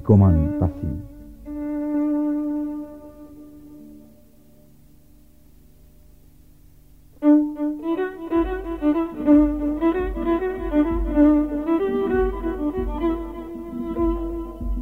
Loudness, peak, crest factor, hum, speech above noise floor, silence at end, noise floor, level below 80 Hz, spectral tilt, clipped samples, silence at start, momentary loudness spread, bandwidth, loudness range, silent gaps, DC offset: -22 LUFS; -4 dBFS; 18 dB; none; 35 dB; 0 s; -52 dBFS; -34 dBFS; -10 dB/octave; under 0.1%; 0 s; 18 LU; 3.9 kHz; 8 LU; none; 0.2%